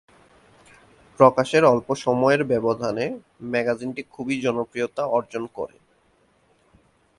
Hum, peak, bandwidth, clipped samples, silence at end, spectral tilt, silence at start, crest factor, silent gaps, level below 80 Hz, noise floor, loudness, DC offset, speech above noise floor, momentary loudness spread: none; 0 dBFS; 11.5 kHz; under 0.1%; 1.5 s; -6 dB/octave; 1.2 s; 24 dB; none; -62 dBFS; -62 dBFS; -22 LUFS; under 0.1%; 40 dB; 15 LU